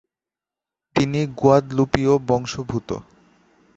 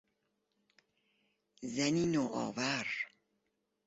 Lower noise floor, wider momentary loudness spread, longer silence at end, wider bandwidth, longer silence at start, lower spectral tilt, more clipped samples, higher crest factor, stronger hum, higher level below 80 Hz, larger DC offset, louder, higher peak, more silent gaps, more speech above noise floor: first, -89 dBFS vs -83 dBFS; about the same, 11 LU vs 10 LU; about the same, 0.75 s vs 0.8 s; about the same, 8 kHz vs 8 kHz; second, 0.95 s vs 1.6 s; first, -6.5 dB/octave vs -4 dB/octave; neither; about the same, 20 dB vs 20 dB; neither; first, -46 dBFS vs -72 dBFS; neither; first, -20 LUFS vs -35 LUFS; first, -2 dBFS vs -18 dBFS; neither; first, 69 dB vs 48 dB